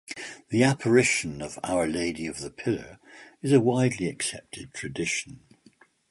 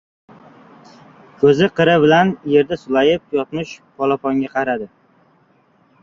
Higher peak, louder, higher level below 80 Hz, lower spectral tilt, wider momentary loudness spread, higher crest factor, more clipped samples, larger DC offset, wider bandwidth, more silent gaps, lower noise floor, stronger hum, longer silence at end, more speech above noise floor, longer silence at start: second, -8 dBFS vs -2 dBFS; second, -26 LUFS vs -16 LUFS; about the same, -58 dBFS vs -56 dBFS; second, -5 dB/octave vs -6.5 dB/octave; first, 17 LU vs 13 LU; about the same, 20 dB vs 16 dB; neither; neither; first, 11.5 kHz vs 7.2 kHz; neither; about the same, -59 dBFS vs -56 dBFS; neither; second, 0.75 s vs 1.15 s; second, 33 dB vs 40 dB; second, 0.1 s vs 1.4 s